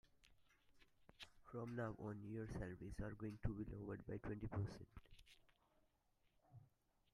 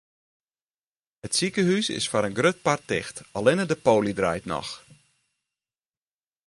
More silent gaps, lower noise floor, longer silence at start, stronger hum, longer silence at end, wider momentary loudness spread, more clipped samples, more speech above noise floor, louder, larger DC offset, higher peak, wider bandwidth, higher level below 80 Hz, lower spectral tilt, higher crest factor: neither; second, -82 dBFS vs under -90 dBFS; second, 0.25 s vs 1.25 s; neither; second, 0.5 s vs 1.7 s; first, 20 LU vs 11 LU; neither; second, 33 dB vs over 66 dB; second, -51 LUFS vs -24 LUFS; neither; second, -30 dBFS vs -4 dBFS; about the same, 12 kHz vs 11.5 kHz; about the same, -62 dBFS vs -58 dBFS; first, -7.5 dB/octave vs -4 dB/octave; about the same, 24 dB vs 22 dB